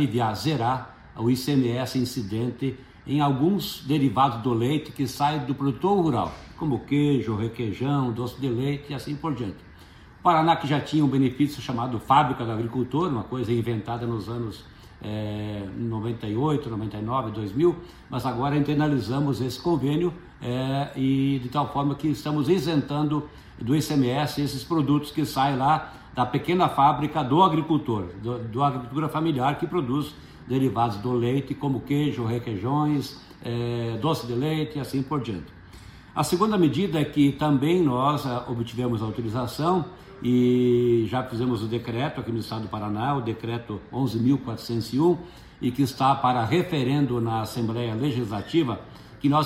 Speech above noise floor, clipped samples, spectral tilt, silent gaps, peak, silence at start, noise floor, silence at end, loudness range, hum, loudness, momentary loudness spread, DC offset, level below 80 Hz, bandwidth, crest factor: 24 dB; under 0.1%; -7 dB/octave; none; -6 dBFS; 0 s; -48 dBFS; 0 s; 4 LU; none; -25 LUFS; 10 LU; under 0.1%; -52 dBFS; 16 kHz; 20 dB